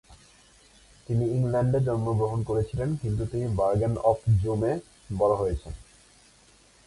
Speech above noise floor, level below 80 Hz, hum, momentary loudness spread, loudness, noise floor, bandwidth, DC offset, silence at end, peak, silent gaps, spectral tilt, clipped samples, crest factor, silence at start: 32 dB; -44 dBFS; none; 7 LU; -27 LUFS; -58 dBFS; 11.5 kHz; under 0.1%; 1.05 s; -10 dBFS; none; -9 dB/octave; under 0.1%; 18 dB; 0.1 s